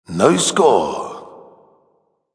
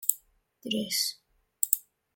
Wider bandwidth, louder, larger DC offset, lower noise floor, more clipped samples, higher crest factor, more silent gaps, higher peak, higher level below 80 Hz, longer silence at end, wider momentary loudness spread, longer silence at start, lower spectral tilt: second, 10.5 kHz vs 17 kHz; first, -15 LUFS vs -29 LUFS; neither; first, -63 dBFS vs -59 dBFS; neither; second, 18 dB vs 32 dB; neither; about the same, 0 dBFS vs -2 dBFS; first, -58 dBFS vs -74 dBFS; first, 1 s vs 0.35 s; first, 17 LU vs 12 LU; about the same, 0.1 s vs 0 s; first, -4 dB/octave vs -1 dB/octave